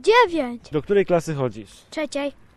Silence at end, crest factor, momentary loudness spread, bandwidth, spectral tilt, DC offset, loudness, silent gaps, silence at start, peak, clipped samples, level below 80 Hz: 0.25 s; 18 dB; 13 LU; 12.5 kHz; -5.5 dB/octave; under 0.1%; -22 LUFS; none; 0.05 s; -4 dBFS; under 0.1%; -52 dBFS